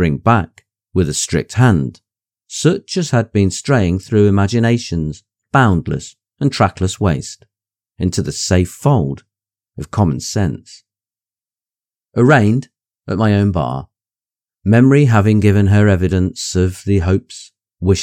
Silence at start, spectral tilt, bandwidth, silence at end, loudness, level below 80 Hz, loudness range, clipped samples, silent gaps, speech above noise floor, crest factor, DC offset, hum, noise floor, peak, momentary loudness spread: 0 s; -6 dB/octave; 13 kHz; 0 s; -15 LUFS; -42 dBFS; 5 LU; under 0.1%; none; over 76 dB; 16 dB; under 0.1%; none; under -90 dBFS; 0 dBFS; 13 LU